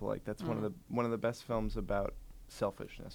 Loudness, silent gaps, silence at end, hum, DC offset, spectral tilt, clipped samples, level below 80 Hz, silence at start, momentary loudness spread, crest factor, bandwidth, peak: -38 LUFS; none; 0 s; none; under 0.1%; -7 dB/octave; under 0.1%; -48 dBFS; 0 s; 9 LU; 16 dB; over 20 kHz; -20 dBFS